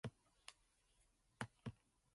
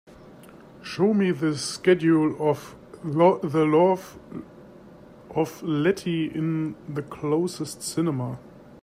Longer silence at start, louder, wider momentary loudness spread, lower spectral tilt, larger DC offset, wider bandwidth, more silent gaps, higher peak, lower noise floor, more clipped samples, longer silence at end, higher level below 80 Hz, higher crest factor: about the same, 0.05 s vs 0.1 s; second, -56 LUFS vs -24 LUFS; second, 11 LU vs 17 LU; about the same, -5 dB/octave vs -6 dB/octave; neither; second, 11.5 kHz vs 15.5 kHz; neither; second, -28 dBFS vs -6 dBFS; first, -79 dBFS vs -47 dBFS; neither; first, 0.4 s vs 0.05 s; second, -76 dBFS vs -62 dBFS; first, 30 dB vs 18 dB